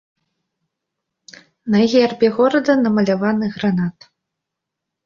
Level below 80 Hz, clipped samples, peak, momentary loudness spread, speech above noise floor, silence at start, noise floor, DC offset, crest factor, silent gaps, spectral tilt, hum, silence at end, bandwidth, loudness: -60 dBFS; under 0.1%; -2 dBFS; 6 LU; 65 dB; 1.65 s; -81 dBFS; under 0.1%; 16 dB; none; -7 dB/octave; none; 1.15 s; 7.2 kHz; -17 LUFS